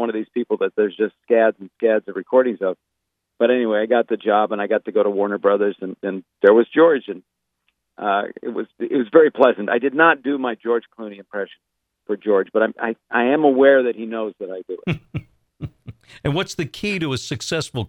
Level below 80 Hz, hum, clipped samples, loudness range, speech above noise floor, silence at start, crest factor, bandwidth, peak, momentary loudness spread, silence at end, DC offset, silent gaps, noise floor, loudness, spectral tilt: -56 dBFS; none; under 0.1%; 4 LU; 52 dB; 0 s; 20 dB; 11 kHz; 0 dBFS; 15 LU; 0 s; under 0.1%; none; -71 dBFS; -19 LUFS; -6 dB/octave